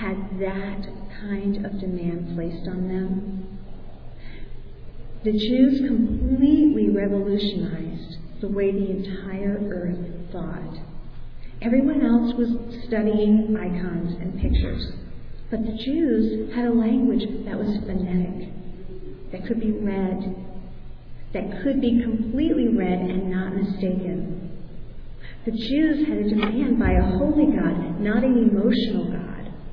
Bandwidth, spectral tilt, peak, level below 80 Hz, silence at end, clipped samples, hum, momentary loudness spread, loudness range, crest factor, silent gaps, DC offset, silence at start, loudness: 5.4 kHz; -10 dB/octave; -6 dBFS; -34 dBFS; 0 s; under 0.1%; none; 21 LU; 8 LU; 16 dB; none; under 0.1%; 0 s; -23 LUFS